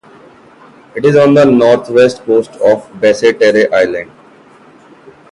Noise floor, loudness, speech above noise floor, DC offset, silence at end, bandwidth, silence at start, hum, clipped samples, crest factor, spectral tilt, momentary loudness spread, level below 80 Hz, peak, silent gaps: -41 dBFS; -10 LUFS; 32 dB; under 0.1%; 1.3 s; 11 kHz; 0.95 s; none; under 0.1%; 12 dB; -6 dB/octave; 8 LU; -52 dBFS; 0 dBFS; none